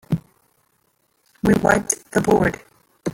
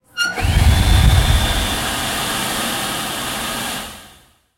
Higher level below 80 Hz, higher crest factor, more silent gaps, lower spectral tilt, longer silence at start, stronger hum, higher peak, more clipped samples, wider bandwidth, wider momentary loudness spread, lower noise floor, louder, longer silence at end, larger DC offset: second, -44 dBFS vs -22 dBFS; about the same, 20 dB vs 18 dB; neither; first, -5.5 dB/octave vs -3.5 dB/octave; about the same, 0.1 s vs 0.15 s; neither; about the same, -2 dBFS vs 0 dBFS; neither; about the same, 17 kHz vs 16.5 kHz; about the same, 11 LU vs 9 LU; first, -66 dBFS vs -49 dBFS; about the same, -20 LUFS vs -18 LUFS; second, 0 s vs 0.5 s; neither